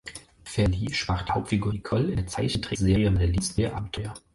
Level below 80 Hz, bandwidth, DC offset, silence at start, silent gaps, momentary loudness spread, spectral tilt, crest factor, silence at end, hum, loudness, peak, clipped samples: -36 dBFS; 11.5 kHz; under 0.1%; 0.05 s; none; 11 LU; -5.5 dB/octave; 16 dB; 0.15 s; none; -26 LUFS; -10 dBFS; under 0.1%